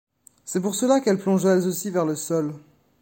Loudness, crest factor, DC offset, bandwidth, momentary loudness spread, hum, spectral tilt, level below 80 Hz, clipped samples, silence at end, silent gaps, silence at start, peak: -23 LUFS; 16 dB; under 0.1%; 17 kHz; 11 LU; none; -5.5 dB/octave; -68 dBFS; under 0.1%; 0.4 s; none; 0.45 s; -6 dBFS